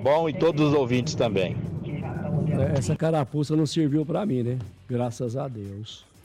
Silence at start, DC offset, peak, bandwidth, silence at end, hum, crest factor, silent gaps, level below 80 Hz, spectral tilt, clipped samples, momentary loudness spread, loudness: 0 s; under 0.1%; -14 dBFS; 11.5 kHz; 0.25 s; none; 12 dB; none; -52 dBFS; -7 dB/octave; under 0.1%; 10 LU; -25 LUFS